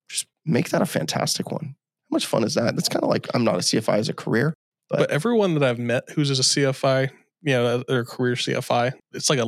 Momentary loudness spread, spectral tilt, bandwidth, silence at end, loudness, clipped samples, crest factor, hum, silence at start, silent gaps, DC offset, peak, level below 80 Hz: 8 LU; -4.5 dB/octave; 15.5 kHz; 0 s; -23 LUFS; under 0.1%; 18 dB; none; 0.1 s; 4.55-4.72 s; under 0.1%; -4 dBFS; -74 dBFS